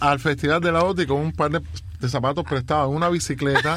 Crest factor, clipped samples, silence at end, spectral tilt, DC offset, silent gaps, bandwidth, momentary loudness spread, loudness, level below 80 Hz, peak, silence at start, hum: 18 dB; under 0.1%; 0 s; -5.5 dB/octave; under 0.1%; none; 15 kHz; 7 LU; -22 LUFS; -42 dBFS; -4 dBFS; 0 s; none